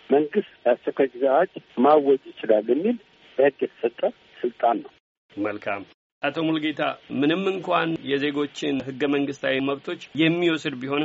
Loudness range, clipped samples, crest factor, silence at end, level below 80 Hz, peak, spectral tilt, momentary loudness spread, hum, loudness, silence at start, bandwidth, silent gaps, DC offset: 5 LU; under 0.1%; 18 dB; 0 s; -70 dBFS; -6 dBFS; -3.5 dB/octave; 10 LU; none; -24 LUFS; 0.1 s; 7.8 kHz; 5.00-5.29 s, 5.94-6.21 s; under 0.1%